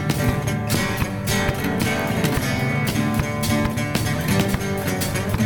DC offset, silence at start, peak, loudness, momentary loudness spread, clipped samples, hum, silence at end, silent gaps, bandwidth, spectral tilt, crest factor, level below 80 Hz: under 0.1%; 0 s; -6 dBFS; -22 LUFS; 2 LU; under 0.1%; none; 0 s; none; over 20 kHz; -5 dB/octave; 16 dB; -36 dBFS